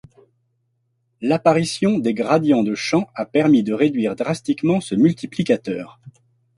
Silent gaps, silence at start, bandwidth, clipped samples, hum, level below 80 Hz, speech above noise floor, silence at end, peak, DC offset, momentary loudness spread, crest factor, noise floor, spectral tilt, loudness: none; 1.2 s; 11.5 kHz; under 0.1%; none; -60 dBFS; 50 dB; 0.45 s; -2 dBFS; under 0.1%; 8 LU; 18 dB; -69 dBFS; -6.5 dB/octave; -19 LUFS